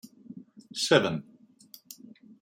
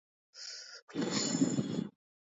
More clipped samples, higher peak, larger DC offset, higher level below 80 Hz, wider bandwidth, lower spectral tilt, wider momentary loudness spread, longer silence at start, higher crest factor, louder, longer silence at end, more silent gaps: neither; first, -6 dBFS vs -16 dBFS; neither; about the same, -72 dBFS vs -76 dBFS; first, 16.5 kHz vs 8.2 kHz; about the same, -4 dB/octave vs -4 dB/octave; first, 25 LU vs 15 LU; second, 0.05 s vs 0.35 s; first, 26 dB vs 20 dB; first, -27 LUFS vs -35 LUFS; first, 0.5 s vs 0.35 s; second, none vs 0.82-0.87 s